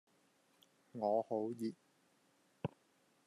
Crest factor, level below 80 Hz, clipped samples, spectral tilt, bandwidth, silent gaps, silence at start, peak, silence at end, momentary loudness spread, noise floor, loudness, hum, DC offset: 20 dB; -86 dBFS; under 0.1%; -8 dB/octave; 13.5 kHz; none; 0.95 s; -24 dBFS; 0.6 s; 11 LU; -75 dBFS; -41 LUFS; none; under 0.1%